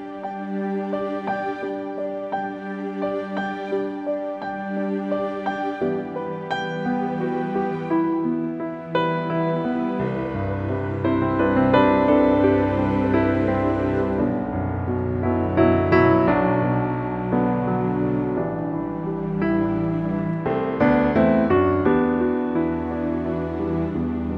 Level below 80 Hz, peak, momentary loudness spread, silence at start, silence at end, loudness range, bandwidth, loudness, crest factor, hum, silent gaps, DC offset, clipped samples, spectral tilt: -44 dBFS; -4 dBFS; 10 LU; 0 s; 0 s; 8 LU; 6.6 kHz; -22 LUFS; 18 dB; none; none; under 0.1%; under 0.1%; -9.5 dB/octave